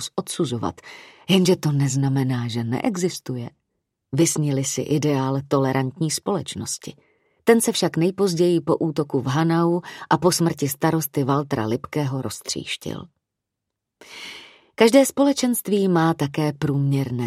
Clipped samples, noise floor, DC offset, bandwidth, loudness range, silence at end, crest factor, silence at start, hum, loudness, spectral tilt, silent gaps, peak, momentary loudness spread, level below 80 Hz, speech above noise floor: under 0.1%; -82 dBFS; under 0.1%; 16 kHz; 4 LU; 0 s; 20 dB; 0 s; none; -21 LUFS; -5.5 dB/octave; none; -2 dBFS; 13 LU; -60 dBFS; 61 dB